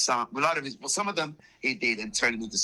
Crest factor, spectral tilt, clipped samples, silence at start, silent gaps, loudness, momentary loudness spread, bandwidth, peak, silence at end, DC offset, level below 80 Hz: 18 dB; -1.5 dB/octave; under 0.1%; 0 s; none; -28 LUFS; 5 LU; 14 kHz; -10 dBFS; 0 s; under 0.1%; -64 dBFS